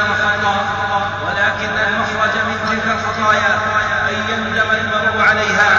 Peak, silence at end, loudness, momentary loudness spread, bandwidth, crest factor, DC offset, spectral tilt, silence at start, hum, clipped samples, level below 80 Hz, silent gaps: -2 dBFS; 0 s; -15 LUFS; 5 LU; 7.8 kHz; 14 dB; under 0.1%; -4 dB/octave; 0 s; none; under 0.1%; -42 dBFS; none